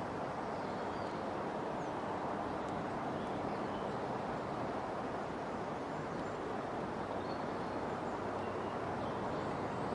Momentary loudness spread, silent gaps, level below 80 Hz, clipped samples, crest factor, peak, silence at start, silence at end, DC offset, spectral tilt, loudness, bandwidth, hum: 2 LU; none; -62 dBFS; under 0.1%; 14 dB; -26 dBFS; 0 s; 0 s; under 0.1%; -6.5 dB/octave; -40 LUFS; 11.5 kHz; none